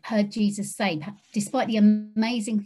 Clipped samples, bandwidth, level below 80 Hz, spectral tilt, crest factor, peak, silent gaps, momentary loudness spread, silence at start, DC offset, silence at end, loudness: under 0.1%; 12.5 kHz; -70 dBFS; -5.5 dB/octave; 14 dB; -10 dBFS; none; 10 LU; 0.05 s; under 0.1%; 0 s; -25 LUFS